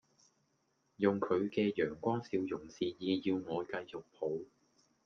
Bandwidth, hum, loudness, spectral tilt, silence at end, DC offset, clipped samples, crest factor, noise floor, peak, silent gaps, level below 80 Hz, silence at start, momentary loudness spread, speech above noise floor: 7 kHz; none; -36 LUFS; -7 dB/octave; 0.6 s; under 0.1%; under 0.1%; 22 dB; -78 dBFS; -16 dBFS; none; -74 dBFS; 1 s; 9 LU; 42 dB